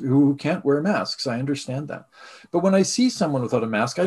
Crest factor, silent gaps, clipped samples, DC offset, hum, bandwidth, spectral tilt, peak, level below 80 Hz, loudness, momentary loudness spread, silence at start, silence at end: 16 dB; none; under 0.1%; under 0.1%; none; 12.5 kHz; -5.5 dB/octave; -6 dBFS; -64 dBFS; -22 LUFS; 10 LU; 0 s; 0 s